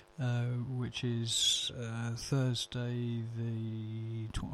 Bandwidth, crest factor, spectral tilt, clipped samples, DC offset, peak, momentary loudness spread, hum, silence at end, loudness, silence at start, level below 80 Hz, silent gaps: 13 kHz; 16 dB; -4 dB/octave; under 0.1%; under 0.1%; -18 dBFS; 11 LU; none; 0 s; -35 LUFS; 0 s; -54 dBFS; none